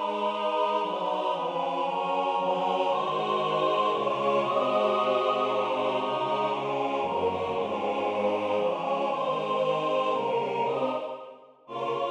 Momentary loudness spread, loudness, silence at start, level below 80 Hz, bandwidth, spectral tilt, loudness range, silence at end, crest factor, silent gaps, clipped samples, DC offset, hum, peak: 4 LU; -27 LUFS; 0 s; -72 dBFS; 9.6 kHz; -5.5 dB/octave; 2 LU; 0 s; 14 dB; none; under 0.1%; under 0.1%; none; -12 dBFS